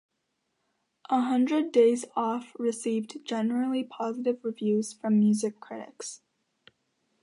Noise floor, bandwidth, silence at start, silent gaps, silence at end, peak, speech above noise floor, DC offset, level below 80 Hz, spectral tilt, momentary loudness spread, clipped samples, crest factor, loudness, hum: -79 dBFS; 11.5 kHz; 1.1 s; none; 1.05 s; -10 dBFS; 52 dB; under 0.1%; -82 dBFS; -5.5 dB/octave; 16 LU; under 0.1%; 18 dB; -27 LUFS; none